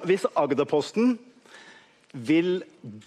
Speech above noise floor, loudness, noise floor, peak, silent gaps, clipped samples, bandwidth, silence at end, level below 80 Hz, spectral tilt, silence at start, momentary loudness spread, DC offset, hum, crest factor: 29 dB; -25 LUFS; -53 dBFS; -8 dBFS; none; under 0.1%; 12 kHz; 0.05 s; -76 dBFS; -6 dB/octave; 0 s; 14 LU; under 0.1%; none; 18 dB